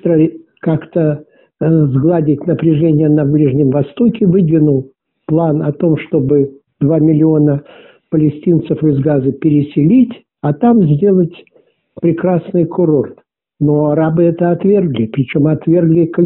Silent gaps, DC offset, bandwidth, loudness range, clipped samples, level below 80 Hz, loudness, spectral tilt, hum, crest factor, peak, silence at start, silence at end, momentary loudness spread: none; under 0.1%; 3.9 kHz; 2 LU; under 0.1%; -48 dBFS; -13 LUFS; -10 dB/octave; none; 10 dB; -2 dBFS; 0.05 s; 0 s; 7 LU